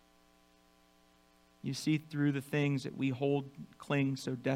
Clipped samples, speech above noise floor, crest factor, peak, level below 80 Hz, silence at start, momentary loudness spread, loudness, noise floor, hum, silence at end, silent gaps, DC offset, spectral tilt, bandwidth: under 0.1%; 33 dB; 18 dB; -18 dBFS; -74 dBFS; 1.65 s; 9 LU; -35 LUFS; -66 dBFS; 60 Hz at -65 dBFS; 0 s; none; under 0.1%; -6.5 dB/octave; 15 kHz